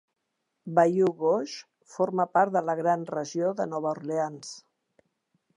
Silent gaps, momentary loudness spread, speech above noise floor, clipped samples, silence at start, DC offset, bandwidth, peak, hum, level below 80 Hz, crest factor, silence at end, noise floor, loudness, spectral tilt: none; 19 LU; 54 dB; under 0.1%; 0.65 s; under 0.1%; 11 kHz; -8 dBFS; none; -82 dBFS; 20 dB; 0.95 s; -81 dBFS; -27 LUFS; -6 dB/octave